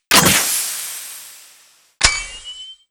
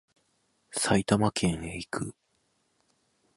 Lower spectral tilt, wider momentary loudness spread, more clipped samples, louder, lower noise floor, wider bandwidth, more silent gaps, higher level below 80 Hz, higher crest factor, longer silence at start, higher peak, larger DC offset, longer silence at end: second, -1 dB/octave vs -4.5 dB/octave; first, 22 LU vs 12 LU; neither; first, -15 LUFS vs -28 LUFS; second, -51 dBFS vs -73 dBFS; first, over 20 kHz vs 11.5 kHz; neither; first, -38 dBFS vs -54 dBFS; about the same, 20 dB vs 22 dB; second, 0.1 s vs 0.7 s; first, 0 dBFS vs -10 dBFS; neither; second, 0.15 s vs 1.25 s